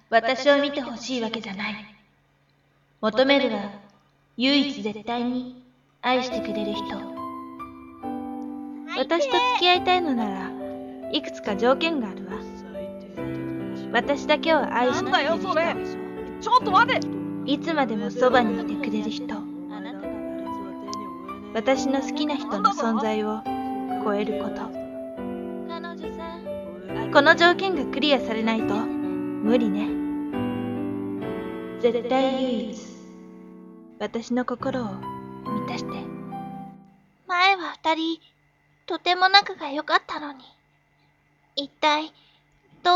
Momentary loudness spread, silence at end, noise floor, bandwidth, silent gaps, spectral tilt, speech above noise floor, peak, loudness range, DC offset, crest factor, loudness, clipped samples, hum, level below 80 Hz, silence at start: 16 LU; 0 s; -64 dBFS; 12.5 kHz; none; -4.5 dB/octave; 40 dB; 0 dBFS; 8 LU; under 0.1%; 26 dB; -24 LUFS; under 0.1%; none; -58 dBFS; 0.1 s